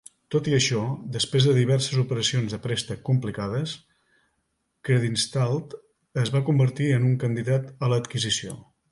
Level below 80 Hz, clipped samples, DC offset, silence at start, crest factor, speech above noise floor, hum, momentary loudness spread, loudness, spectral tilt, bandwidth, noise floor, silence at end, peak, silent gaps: -58 dBFS; under 0.1%; under 0.1%; 0.3 s; 18 dB; 51 dB; none; 10 LU; -24 LUFS; -5 dB/octave; 11.5 kHz; -75 dBFS; 0.3 s; -8 dBFS; none